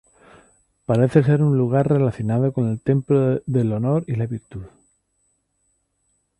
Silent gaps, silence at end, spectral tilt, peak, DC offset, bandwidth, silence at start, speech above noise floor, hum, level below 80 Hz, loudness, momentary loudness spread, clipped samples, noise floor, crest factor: none; 1.7 s; -10 dB/octave; -2 dBFS; under 0.1%; 10.5 kHz; 0.9 s; 50 dB; none; -52 dBFS; -20 LUFS; 12 LU; under 0.1%; -69 dBFS; 18 dB